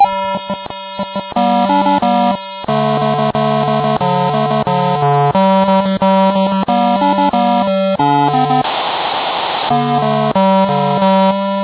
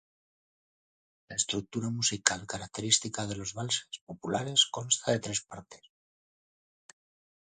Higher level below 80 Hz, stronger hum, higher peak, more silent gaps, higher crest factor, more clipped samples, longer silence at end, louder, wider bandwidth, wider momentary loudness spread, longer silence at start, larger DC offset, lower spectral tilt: first, -50 dBFS vs -64 dBFS; neither; about the same, 0 dBFS vs -2 dBFS; second, none vs 4.01-4.07 s; second, 12 dB vs 32 dB; neither; second, 0 s vs 1.65 s; first, -14 LUFS vs -30 LUFS; second, 4 kHz vs 9.8 kHz; second, 6 LU vs 12 LU; second, 0 s vs 1.3 s; neither; first, -10.5 dB/octave vs -2 dB/octave